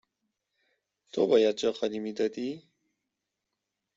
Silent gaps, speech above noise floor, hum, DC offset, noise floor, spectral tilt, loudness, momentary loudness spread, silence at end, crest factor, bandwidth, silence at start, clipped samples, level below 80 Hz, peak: none; 58 dB; none; under 0.1%; -85 dBFS; -5 dB/octave; -28 LUFS; 14 LU; 1.4 s; 20 dB; 7.8 kHz; 1.15 s; under 0.1%; -76 dBFS; -10 dBFS